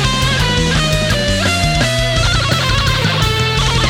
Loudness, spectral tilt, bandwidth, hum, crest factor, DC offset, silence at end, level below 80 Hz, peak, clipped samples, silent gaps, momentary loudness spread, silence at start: -14 LUFS; -4 dB/octave; 17.5 kHz; none; 14 dB; under 0.1%; 0 s; -22 dBFS; 0 dBFS; under 0.1%; none; 1 LU; 0 s